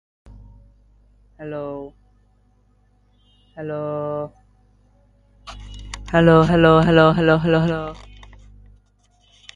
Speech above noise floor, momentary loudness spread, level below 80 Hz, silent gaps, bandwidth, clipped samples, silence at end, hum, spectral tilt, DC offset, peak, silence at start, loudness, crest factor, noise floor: 42 dB; 25 LU; -42 dBFS; none; 9.8 kHz; under 0.1%; 1.6 s; 50 Hz at -45 dBFS; -7.5 dB/octave; under 0.1%; -2 dBFS; 1.4 s; -17 LUFS; 20 dB; -59 dBFS